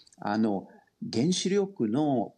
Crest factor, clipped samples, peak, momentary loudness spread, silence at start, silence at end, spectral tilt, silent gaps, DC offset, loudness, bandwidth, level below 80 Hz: 12 dB; under 0.1%; -16 dBFS; 8 LU; 0.2 s; 0.05 s; -5.5 dB/octave; none; under 0.1%; -28 LUFS; 10.5 kHz; -76 dBFS